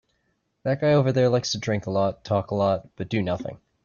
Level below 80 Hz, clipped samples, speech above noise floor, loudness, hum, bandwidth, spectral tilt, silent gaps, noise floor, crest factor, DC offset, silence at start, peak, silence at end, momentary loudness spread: -58 dBFS; under 0.1%; 49 dB; -24 LUFS; none; 7.2 kHz; -6 dB/octave; none; -72 dBFS; 16 dB; under 0.1%; 0.65 s; -10 dBFS; 0.3 s; 9 LU